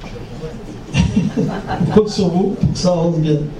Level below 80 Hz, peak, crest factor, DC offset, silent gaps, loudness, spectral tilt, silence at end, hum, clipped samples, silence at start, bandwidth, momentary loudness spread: -32 dBFS; 0 dBFS; 16 dB; under 0.1%; none; -17 LUFS; -7 dB/octave; 0 s; none; under 0.1%; 0 s; 10.5 kHz; 15 LU